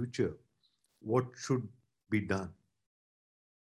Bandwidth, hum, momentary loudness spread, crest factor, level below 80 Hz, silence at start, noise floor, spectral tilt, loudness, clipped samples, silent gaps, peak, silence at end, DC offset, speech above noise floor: 12 kHz; none; 15 LU; 22 dB; -62 dBFS; 0 s; -76 dBFS; -6.5 dB/octave; -35 LUFS; under 0.1%; none; -16 dBFS; 1.25 s; under 0.1%; 42 dB